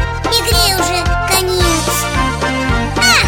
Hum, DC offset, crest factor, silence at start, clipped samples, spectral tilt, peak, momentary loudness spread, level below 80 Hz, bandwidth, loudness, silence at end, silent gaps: none; under 0.1%; 14 dB; 0 s; under 0.1%; -3 dB/octave; 0 dBFS; 5 LU; -22 dBFS; 17 kHz; -13 LUFS; 0 s; none